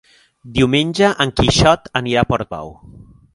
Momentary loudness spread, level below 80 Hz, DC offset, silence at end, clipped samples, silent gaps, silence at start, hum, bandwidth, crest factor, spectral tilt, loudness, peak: 13 LU; -34 dBFS; under 0.1%; 0.35 s; under 0.1%; none; 0.45 s; none; 11.5 kHz; 16 dB; -5 dB/octave; -16 LUFS; 0 dBFS